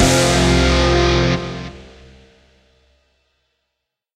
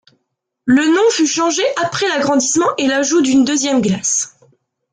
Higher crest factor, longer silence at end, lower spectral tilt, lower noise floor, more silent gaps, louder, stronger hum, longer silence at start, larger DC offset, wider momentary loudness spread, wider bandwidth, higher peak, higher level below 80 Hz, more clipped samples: first, 18 dB vs 12 dB; first, 2.35 s vs 0.65 s; first, -4.5 dB/octave vs -3 dB/octave; first, -78 dBFS vs -72 dBFS; neither; about the same, -15 LUFS vs -14 LUFS; neither; second, 0 s vs 0.65 s; neither; first, 16 LU vs 4 LU; first, 15 kHz vs 9.6 kHz; about the same, -2 dBFS vs -4 dBFS; first, -26 dBFS vs -56 dBFS; neither